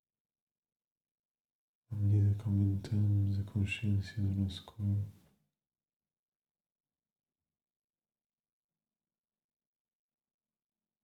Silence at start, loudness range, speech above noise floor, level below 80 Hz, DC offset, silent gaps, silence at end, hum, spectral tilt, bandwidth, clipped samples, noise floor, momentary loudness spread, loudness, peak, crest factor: 1.9 s; 11 LU; over 58 dB; -68 dBFS; under 0.1%; none; 5.9 s; none; -8 dB/octave; 8.4 kHz; under 0.1%; under -90 dBFS; 8 LU; -34 LUFS; -20 dBFS; 18 dB